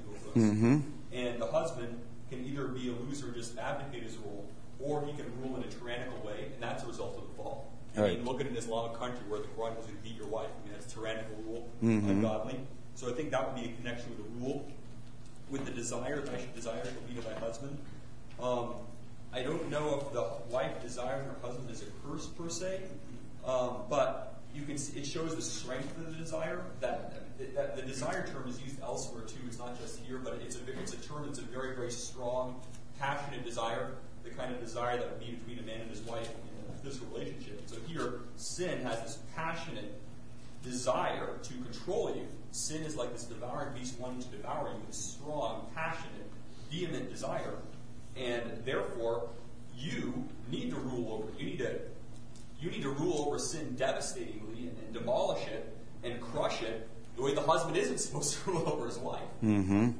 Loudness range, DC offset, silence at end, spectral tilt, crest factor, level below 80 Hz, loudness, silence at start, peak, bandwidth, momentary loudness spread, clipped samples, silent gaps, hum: 6 LU; 0.9%; 0 s; -5 dB/octave; 22 dB; -58 dBFS; -38 LUFS; 0 s; -14 dBFS; 11 kHz; 13 LU; under 0.1%; none; none